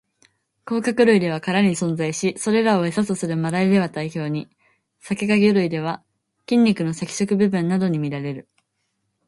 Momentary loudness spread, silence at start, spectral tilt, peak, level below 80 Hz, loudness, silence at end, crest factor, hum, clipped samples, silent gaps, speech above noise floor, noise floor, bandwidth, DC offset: 11 LU; 0.65 s; -6 dB/octave; -4 dBFS; -62 dBFS; -21 LUFS; 0.85 s; 18 dB; none; under 0.1%; none; 53 dB; -73 dBFS; 11.5 kHz; under 0.1%